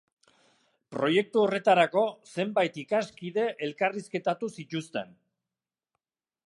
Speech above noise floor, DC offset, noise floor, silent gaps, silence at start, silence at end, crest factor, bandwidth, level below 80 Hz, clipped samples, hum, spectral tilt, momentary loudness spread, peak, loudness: over 62 dB; under 0.1%; under -90 dBFS; none; 0.9 s; 1.45 s; 20 dB; 11.5 kHz; -78 dBFS; under 0.1%; none; -5.5 dB/octave; 13 LU; -8 dBFS; -28 LUFS